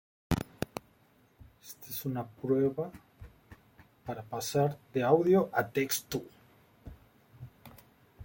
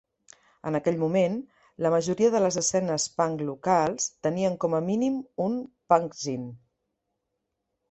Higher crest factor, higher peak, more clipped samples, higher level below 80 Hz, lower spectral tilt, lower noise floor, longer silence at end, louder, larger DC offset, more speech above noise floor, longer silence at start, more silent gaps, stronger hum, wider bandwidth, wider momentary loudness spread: about the same, 22 dB vs 22 dB; second, -12 dBFS vs -6 dBFS; neither; first, -58 dBFS vs -66 dBFS; about the same, -5.5 dB/octave vs -5 dB/octave; second, -65 dBFS vs -81 dBFS; second, 0 s vs 1.35 s; second, -32 LUFS vs -26 LUFS; neither; second, 35 dB vs 55 dB; second, 0.3 s vs 0.65 s; neither; neither; first, 17 kHz vs 8.4 kHz; first, 26 LU vs 9 LU